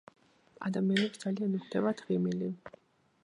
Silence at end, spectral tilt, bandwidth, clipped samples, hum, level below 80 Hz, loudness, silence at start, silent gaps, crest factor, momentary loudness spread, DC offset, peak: 0.55 s; -6.5 dB/octave; 11 kHz; under 0.1%; none; -76 dBFS; -33 LUFS; 0.6 s; none; 20 dB; 10 LU; under 0.1%; -14 dBFS